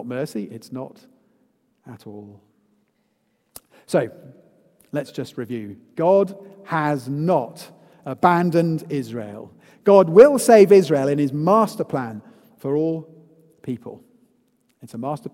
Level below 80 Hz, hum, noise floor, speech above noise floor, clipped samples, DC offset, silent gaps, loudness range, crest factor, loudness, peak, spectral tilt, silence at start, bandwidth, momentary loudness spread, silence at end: -68 dBFS; none; -68 dBFS; 49 dB; under 0.1%; under 0.1%; none; 16 LU; 20 dB; -18 LUFS; 0 dBFS; -6.5 dB/octave; 0 s; 16.5 kHz; 26 LU; 0.05 s